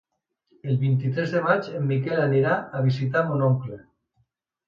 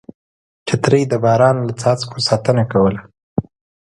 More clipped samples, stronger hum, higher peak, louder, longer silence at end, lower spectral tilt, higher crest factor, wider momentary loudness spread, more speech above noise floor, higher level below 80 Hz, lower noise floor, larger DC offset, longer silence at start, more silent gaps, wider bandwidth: neither; neither; second, -6 dBFS vs 0 dBFS; second, -24 LUFS vs -16 LUFS; first, 0.9 s vs 0.4 s; first, -9 dB/octave vs -6 dB/octave; about the same, 18 dB vs 16 dB; second, 6 LU vs 12 LU; second, 48 dB vs over 75 dB; second, -62 dBFS vs -46 dBFS; second, -70 dBFS vs under -90 dBFS; neither; about the same, 0.65 s vs 0.65 s; second, none vs 3.23-3.36 s; second, 6.8 kHz vs 11.5 kHz